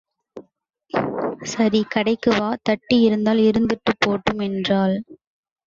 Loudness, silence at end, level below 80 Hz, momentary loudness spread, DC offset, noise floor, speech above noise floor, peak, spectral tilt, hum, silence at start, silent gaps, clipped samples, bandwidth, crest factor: -20 LUFS; 0.5 s; -52 dBFS; 8 LU; under 0.1%; -61 dBFS; 42 dB; -4 dBFS; -5.5 dB/octave; none; 0.35 s; none; under 0.1%; 7.6 kHz; 16 dB